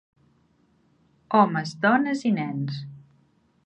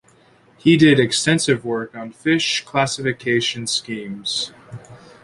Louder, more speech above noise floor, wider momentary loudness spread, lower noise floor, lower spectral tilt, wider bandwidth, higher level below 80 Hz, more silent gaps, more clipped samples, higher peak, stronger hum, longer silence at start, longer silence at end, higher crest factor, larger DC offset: second, -23 LUFS vs -19 LUFS; first, 41 dB vs 34 dB; second, 13 LU vs 16 LU; first, -64 dBFS vs -53 dBFS; first, -6.5 dB/octave vs -4 dB/octave; second, 9 kHz vs 11.5 kHz; second, -72 dBFS vs -56 dBFS; neither; neither; about the same, -4 dBFS vs -2 dBFS; neither; first, 1.3 s vs 0.65 s; first, 0.65 s vs 0.3 s; about the same, 22 dB vs 18 dB; neither